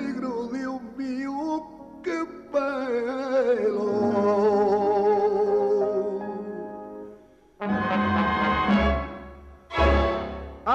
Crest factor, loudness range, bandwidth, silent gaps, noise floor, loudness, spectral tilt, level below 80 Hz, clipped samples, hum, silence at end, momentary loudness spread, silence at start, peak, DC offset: 16 dB; 5 LU; 8 kHz; none; -51 dBFS; -25 LUFS; -7 dB/octave; -38 dBFS; under 0.1%; none; 0 s; 14 LU; 0 s; -10 dBFS; under 0.1%